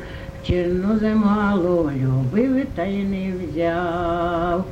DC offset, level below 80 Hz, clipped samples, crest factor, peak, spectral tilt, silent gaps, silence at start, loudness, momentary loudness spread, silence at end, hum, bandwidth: under 0.1%; -38 dBFS; under 0.1%; 14 dB; -6 dBFS; -8.5 dB/octave; none; 0 s; -21 LUFS; 6 LU; 0 s; none; 8.2 kHz